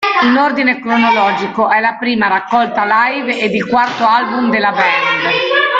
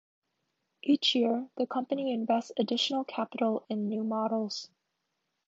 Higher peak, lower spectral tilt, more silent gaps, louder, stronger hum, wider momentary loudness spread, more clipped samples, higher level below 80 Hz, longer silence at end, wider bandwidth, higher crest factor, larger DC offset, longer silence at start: first, 0 dBFS vs -14 dBFS; about the same, -5 dB/octave vs -4.5 dB/octave; neither; first, -12 LUFS vs -30 LUFS; neither; second, 3 LU vs 9 LU; neither; first, -56 dBFS vs -86 dBFS; second, 0 s vs 0.8 s; about the same, 7.8 kHz vs 7.8 kHz; second, 12 dB vs 18 dB; neither; second, 0 s vs 0.85 s